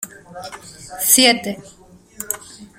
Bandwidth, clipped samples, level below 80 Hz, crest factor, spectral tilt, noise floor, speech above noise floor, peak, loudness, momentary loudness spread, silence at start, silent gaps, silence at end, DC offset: 16.5 kHz; under 0.1%; -56 dBFS; 22 dB; -1 dB/octave; -37 dBFS; 19 dB; 0 dBFS; -15 LUFS; 24 LU; 0 s; none; 0.15 s; under 0.1%